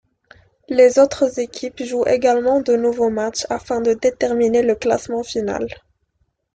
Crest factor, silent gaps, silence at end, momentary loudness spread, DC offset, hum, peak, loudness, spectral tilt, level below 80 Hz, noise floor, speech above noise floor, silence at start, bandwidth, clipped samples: 16 dB; none; 0.75 s; 10 LU; under 0.1%; none; -2 dBFS; -18 LUFS; -4 dB/octave; -52 dBFS; -68 dBFS; 50 dB; 0.7 s; 9.2 kHz; under 0.1%